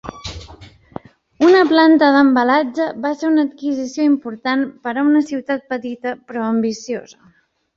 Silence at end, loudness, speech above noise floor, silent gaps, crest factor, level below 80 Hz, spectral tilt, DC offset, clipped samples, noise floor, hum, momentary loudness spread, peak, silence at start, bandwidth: 0.7 s; -16 LUFS; 26 dB; none; 16 dB; -50 dBFS; -5 dB/octave; under 0.1%; under 0.1%; -42 dBFS; none; 20 LU; -2 dBFS; 0.05 s; 7.4 kHz